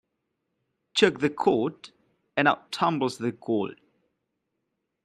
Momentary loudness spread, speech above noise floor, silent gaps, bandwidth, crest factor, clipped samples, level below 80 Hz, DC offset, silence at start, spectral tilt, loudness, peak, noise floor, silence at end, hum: 9 LU; 55 dB; none; 12.5 kHz; 22 dB; under 0.1%; -70 dBFS; under 0.1%; 0.95 s; -5 dB/octave; -26 LUFS; -6 dBFS; -80 dBFS; 1.3 s; none